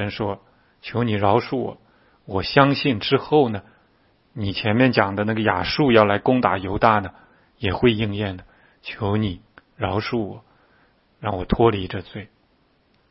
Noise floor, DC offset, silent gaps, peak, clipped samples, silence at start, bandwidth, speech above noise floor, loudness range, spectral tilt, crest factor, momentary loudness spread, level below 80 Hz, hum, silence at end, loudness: -62 dBFS; under 0.1%; none; 0 dBFS; under 0.1%; 0 s; 5.8 kHz; 41 dB; 7 LU; -10 dB/octave; 22 dB; 16 LU; -44 dBFS; none; 0.85 s; -21 LUFS